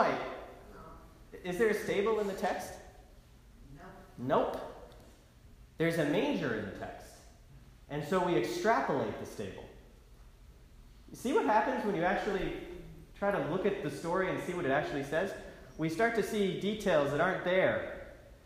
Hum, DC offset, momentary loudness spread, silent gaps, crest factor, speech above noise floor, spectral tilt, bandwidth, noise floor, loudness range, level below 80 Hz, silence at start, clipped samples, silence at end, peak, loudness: none; under 0.1%; 22 LU; none; 20 dB; 25 dB; -5.5 dB/octave; 15.5 kHz; -57 dBFS; 4 LU; -56 dBFS; 0 s; under 0.1%; 0.1 s; -14 dBFS; -33 LUFS